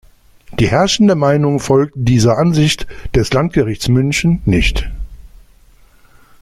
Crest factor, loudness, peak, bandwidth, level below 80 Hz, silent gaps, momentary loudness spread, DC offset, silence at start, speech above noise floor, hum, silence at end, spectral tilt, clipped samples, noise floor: 14 dB; -14 LUFS; -2 dBFS; 15 kHz; -28 dBFS; none; 10 LU; under 0.1%; 0.5 s; 33 dB; none; 1.2 s; -5.5 dB/octave; under 0.1%; -46 dBFS